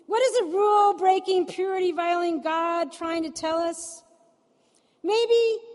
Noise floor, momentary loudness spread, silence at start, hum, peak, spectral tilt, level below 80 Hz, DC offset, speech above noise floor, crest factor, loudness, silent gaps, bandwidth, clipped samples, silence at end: -65 dBFS; 9 LU; 0.1 s; none; -8 dBFS; -2.5 dB/octave; -72 dBFS; under 0.1%; 41 dB; 16 dB; -24 LUFS; none; 11.5 kHz; under 0.1%; 0 s